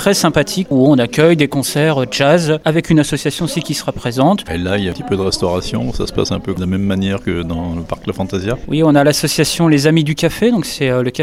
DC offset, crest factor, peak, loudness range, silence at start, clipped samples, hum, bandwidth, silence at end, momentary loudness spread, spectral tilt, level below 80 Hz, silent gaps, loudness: under 0.1%; 14 dB; 0 dBFS; 5 LU; 0 s; under 0.1%; none; 16.5 kHz; 0 s; 9 LU; -5.5 dB/octave; -36 dBFS; none; -15 LUFS